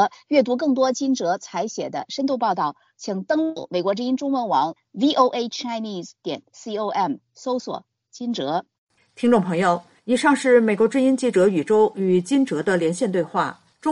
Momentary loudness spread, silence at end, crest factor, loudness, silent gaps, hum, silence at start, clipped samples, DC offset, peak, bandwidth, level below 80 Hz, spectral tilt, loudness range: 12 LU; 0 s; 18 dB; -22 LUFS; 8.78-8.87 s; none; 0 s; under 0.1%; under 0.1%; -4 dBFS; 11.5 kHz; -68 dBFS; -5.5 dB/octave; 7 LU